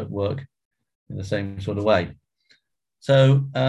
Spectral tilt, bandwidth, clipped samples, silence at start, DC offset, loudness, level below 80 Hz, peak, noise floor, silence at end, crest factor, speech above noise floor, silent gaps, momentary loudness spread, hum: -7.5 dB/octave; 9 kHz; under 0.1%; 0 s; under 0.1%; -21 LUFS; -48 dBFS; -4 dBFS; -67 dBFS; 0 s; 18 dB; 46 dB; 0.65-0.71 s, 0.95-1.06 s; 18 LU; none